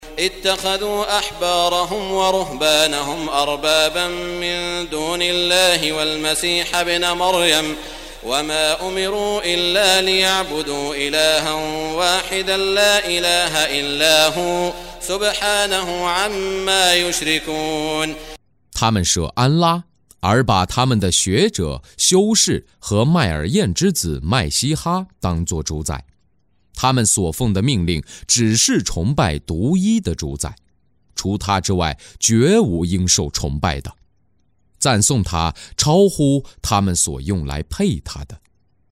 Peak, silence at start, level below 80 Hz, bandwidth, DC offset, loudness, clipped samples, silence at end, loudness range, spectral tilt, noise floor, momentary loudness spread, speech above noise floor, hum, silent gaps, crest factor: 0 dBFS; 0 s; -36 dBFS; 16 kHz; under 0.1%; -17 LUFS; under 0.1%; 0.55 s; 3 LU; -3.5 dB/octave; -64 dBFS; 10 LU; 46 dB; none; none; 18 dB